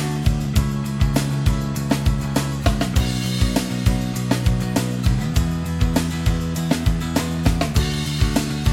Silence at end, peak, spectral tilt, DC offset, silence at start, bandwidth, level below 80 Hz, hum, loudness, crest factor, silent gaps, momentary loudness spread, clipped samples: 0 s; -2 dBFS; -5.5 dB/octave; under 0.1%; 0 s; 17 kHz; -26 dBFS; none; -21 LUFS; 18 dB; none; 2 LU; under 0.1%